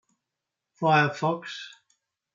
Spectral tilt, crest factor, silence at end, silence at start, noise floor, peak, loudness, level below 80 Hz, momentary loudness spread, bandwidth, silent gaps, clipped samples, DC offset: -6 dB/octave; 20 dB; 0.65 s; 0.8 s; -86 dBFS; -8 dBFS; -25 LUFS; -78 dBFS; 18 LU; 7.6 kHz; none; under 0.1%; under 0.1%